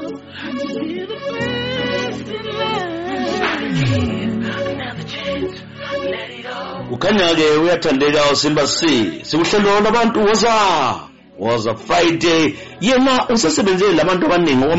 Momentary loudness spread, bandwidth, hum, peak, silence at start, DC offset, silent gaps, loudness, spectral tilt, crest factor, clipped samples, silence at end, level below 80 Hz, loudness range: 12 LU; 8 kHz; none; -4 dBFS; 0 s; under 0.1%; none; -17 LUFS; -3.5 dB/octave; 12 dB; under 0.1%; 0 s; -44 dBFS; 7 LU